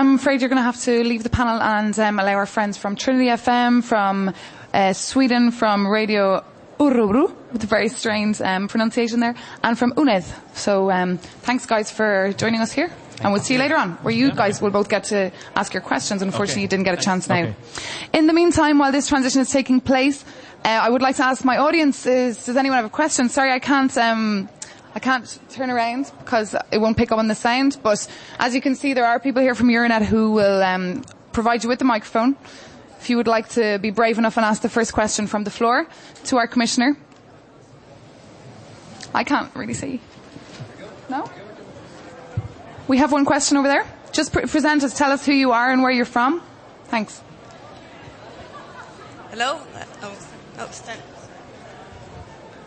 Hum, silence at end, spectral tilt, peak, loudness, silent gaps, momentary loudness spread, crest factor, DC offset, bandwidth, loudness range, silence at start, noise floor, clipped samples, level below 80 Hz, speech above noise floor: none; 0 s; -4.5 dB/octave; -2 dBFS; -19 LUFS; none; 18 LU; 18 dB; under 0.1%; 8.8 kHz; 10 LU; 0 s; -47 dBFS; under 0.1%; -48 dBFS; 28 dB